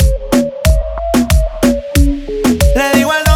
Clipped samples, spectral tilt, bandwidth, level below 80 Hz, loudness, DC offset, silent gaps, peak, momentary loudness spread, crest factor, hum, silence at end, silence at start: under 0.1%; -5.5 dB/octave; 19 kHz; -16 dBFS; -13 LUFS; under 0.1%; none; 0 dBFS; 4 LU; 12 dB; none; 0 s; 0 s